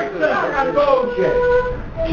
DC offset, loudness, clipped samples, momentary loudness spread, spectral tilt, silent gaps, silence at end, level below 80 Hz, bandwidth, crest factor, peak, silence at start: under 0.1%; -17 LUFS; under 0.1%; 5 LU; -6.5 dB/octave; none; 0 s; -34 dBFS; 7 kHz; 16 dB; -2 dBFS; 0 s